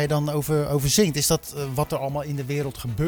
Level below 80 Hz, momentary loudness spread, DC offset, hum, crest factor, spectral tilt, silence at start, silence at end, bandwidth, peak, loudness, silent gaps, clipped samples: -44 dBFS; 9 LU; under 0.1%; none; 18 dB; -4.5 dB/octave; 0 s; 0 s; over 20 kHz; -6 dBFS; -24 LUFS; none; under 0.1%